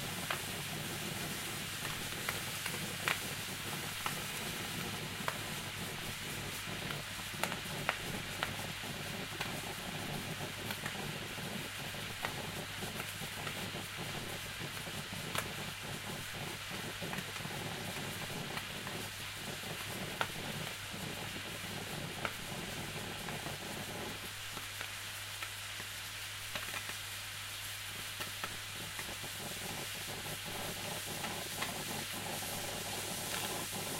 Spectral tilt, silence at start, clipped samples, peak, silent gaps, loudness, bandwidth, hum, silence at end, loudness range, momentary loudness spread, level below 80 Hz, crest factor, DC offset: -2.5 dB/octave; 0 s; under 0.1%; -12 dBFS; none; -40 LUFS; 16 kHz; none; 0 s; 3 LU; 4 LU; -62 dBFS; 28 dB; under 0.1%